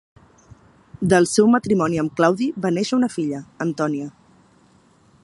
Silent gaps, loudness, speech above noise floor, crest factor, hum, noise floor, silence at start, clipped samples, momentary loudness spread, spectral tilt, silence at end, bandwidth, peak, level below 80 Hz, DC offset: none; -20 LUFS; 36 dB; 20 dB; none; -55 dBFS; 1 s; under 0.1%; 11 LU; -5.5 dB/octave; 1.15 s; 11.5 kHz; -2 dBFS; -56 dBFS; under 0.1%